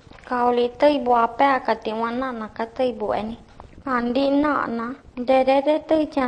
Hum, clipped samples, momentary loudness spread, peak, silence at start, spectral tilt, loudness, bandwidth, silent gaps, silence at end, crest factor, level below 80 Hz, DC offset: none; under 0.1%; 12 LU; -6 dBFS; 0.15 s; -6 dB/octave; -21 LUFS; 9.8 kHz; none; 0 s; 16 dB; -52 dBFS; under 0.1%